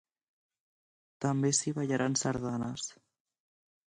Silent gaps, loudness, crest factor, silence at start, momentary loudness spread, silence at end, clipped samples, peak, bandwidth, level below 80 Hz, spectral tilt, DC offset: none; -32 LUFS; 20 dB; 1.2 s; 9 LU; 0.95 s; under 0.1%; -14 dBFS; 11 kHz; -68 dBFS; -4.5 dB/octave; under 0.1%